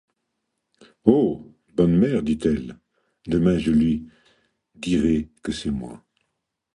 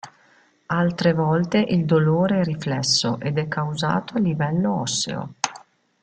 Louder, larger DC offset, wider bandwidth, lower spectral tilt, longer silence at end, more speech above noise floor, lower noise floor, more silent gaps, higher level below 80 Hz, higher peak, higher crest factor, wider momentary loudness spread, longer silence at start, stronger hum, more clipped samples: about the same, -22 LUFS vs -22 LUFS; neither; first, 11 kHz vs 9.4 kHz; first, -7.5 dB/octave vs -5 dB/octave; first, 0.8 s vs 0.45 s; first, 58 dB vs 37 dB; first, -78 dBFS vs -58 dBFS; neither; first, -44 dBFS vs -58 dBFS; about the same, -2 dBFS vs -2 dBFS; about the same, 22 dB vs 20 dB; first, 14 LU vs 8 LU; first, 1.05 s vs 0.05 s; neither; neither